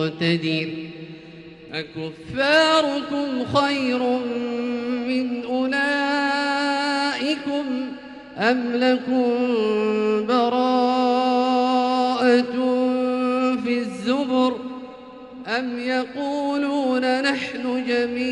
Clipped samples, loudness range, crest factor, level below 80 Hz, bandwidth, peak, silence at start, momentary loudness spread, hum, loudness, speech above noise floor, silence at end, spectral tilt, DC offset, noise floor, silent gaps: under 0.1%; 4 LU; 16 dB; -62 dBFS; 10.5 kHz; -6 dBFS; 0 s; 13 LU; none; -21 LUFS; 20 dB; 0 s; -5 dB/octave; under 0.1%; -42 dBFS; none